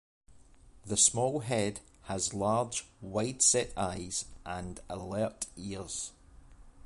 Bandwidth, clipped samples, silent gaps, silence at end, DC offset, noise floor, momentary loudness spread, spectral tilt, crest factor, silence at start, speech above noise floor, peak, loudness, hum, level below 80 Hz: 11.5 kHz; under 0.1%; none; 0 s; under 0.1%; -56 dBFS; 16 LU; -3 dB/octave; 22 dB; 0.3 s; 24 dB; -12 dBFS; -31 LUFS; none; -56 dBFS